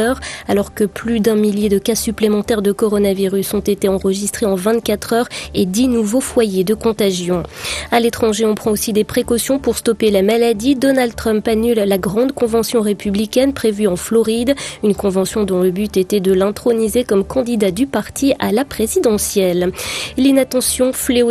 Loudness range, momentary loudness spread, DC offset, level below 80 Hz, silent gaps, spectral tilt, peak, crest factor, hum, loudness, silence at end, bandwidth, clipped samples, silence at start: 1 LU; 4 LU; under 0.1%; -40 dBFS; none; -4.5 dB/octave; 0 dBFS; 16 dB; none; -16 LUFS; 0 s; 15 kHz; under 0.1%; 0 s